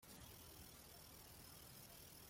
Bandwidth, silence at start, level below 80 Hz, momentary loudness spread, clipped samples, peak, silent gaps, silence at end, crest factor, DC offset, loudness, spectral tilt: 16.5 kHz; 0 s; -72 dBFS; 1 LU; under 0.1%; -46 dBFS; none; 0 s; 14 dB; under 0.1%; -59 LUFS; -3 dB/octave